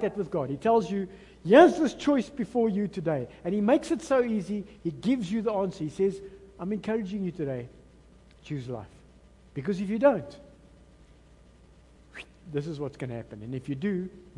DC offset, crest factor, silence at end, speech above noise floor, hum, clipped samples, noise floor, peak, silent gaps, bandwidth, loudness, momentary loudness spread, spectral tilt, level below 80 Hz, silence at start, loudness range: under 0.1%; 24 dB; 0.15 s; 28 dB; none; under 0.1%; -56 dBFS; -4 dBFS; none; 11.5 kHz; -28 LUFS; 16 LU; -7 dB/octave; -58 dBFS; 0 s; 12 LU